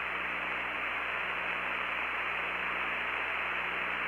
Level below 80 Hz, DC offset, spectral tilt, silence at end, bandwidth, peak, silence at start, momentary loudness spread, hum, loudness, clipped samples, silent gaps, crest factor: -60 dBFS; under 0.1%; -3.5 dB/octave; 0 s; 16 kHz; -20 dBFS; 0 s; 1 LU; 60 Hz at -60 dBFS; -32 LUFS; under 0.1%; none; 14 dB